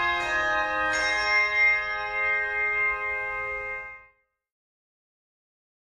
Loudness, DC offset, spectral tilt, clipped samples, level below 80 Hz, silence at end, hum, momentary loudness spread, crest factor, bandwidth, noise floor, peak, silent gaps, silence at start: -24 LUFS; under 0.1%; -1.5 dB/octave; under 0.1%; -54 dBFS; 1.95 s; none; 10 LU; 16 dB; 11.5 kHz; -62 dBFS; -12 dBFS; none; 0 s